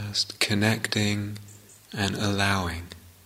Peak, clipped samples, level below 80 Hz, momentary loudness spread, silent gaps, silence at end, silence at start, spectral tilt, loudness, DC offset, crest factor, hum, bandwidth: -6 dBFS; under 0.1%; -52 dBFS; 15 LU; none; 0.15 s; 0 s; -4 dB/octave; -26 LUFS; under 0.1%; 22 dB; none; 16 kHz